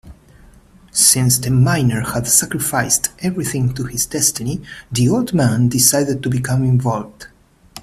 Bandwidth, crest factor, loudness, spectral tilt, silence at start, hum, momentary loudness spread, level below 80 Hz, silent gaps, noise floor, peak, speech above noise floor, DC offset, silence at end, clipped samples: 15.5 kHz; 18 dB; -16 LUFS; -4 dB/octave; 0.05 s; none; 10 LU; -44 dBFS; none; -46 dBFS; 0 dBFS; 29 dB; under 0.1%; 0 s; under 0.1%